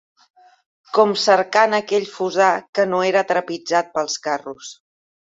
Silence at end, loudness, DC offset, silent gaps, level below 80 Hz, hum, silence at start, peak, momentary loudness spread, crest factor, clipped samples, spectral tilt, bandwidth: 0.65 s; -19 LUFS; under 0.1%; 2.69-2.73 s; -70 dBFS; none; 0.95 s; -2 dBFS; 10 LU; 18 dB; under 0.1%; -3 dB/octave; 7.8 kHz